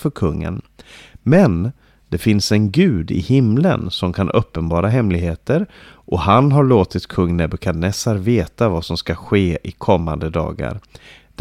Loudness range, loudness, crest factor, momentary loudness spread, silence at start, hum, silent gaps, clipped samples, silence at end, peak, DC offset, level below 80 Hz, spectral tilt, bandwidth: 3 LU; -17 LUFS; 16 dB; 11 LU; 0 s; none; none; under 0.1%; 0.6 s; -2 dBFS; under 0.1%; -36 dBFS; -7 dB/octave; 15.5 kHz